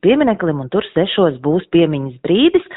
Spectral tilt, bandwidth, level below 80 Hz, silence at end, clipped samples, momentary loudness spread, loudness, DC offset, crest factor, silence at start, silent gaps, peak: -5 dB/octave; 4.1 kHz; -50 dBFS; 0 s; under 0.1%; 6 LU; -16 LUFS; under 0.1%; 14 dB; 0.05 s; none; -2 dBFS